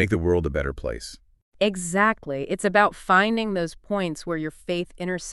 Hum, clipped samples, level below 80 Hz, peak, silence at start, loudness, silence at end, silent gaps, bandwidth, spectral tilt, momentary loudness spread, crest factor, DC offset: none; under 0.1%; -42 dBFS; -4 dBFS; 0 s; -24 LUFS; 0 s; 1.42-1.52 s; 12 kHz; -5 dB/octave; 10 LU; 20 dB; under 0.1%